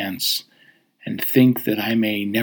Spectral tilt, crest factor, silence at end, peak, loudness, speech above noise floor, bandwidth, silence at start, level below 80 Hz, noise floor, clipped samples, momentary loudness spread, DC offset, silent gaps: -4.5 dB/octave; 18 dB; 0 s; -2 dBFS; -20 LUFS; 36 dB; over 20 kHz; 0 s; -74 dBFS; -56 dBFS; under 0.1%; 11 LU; under 0.1%; none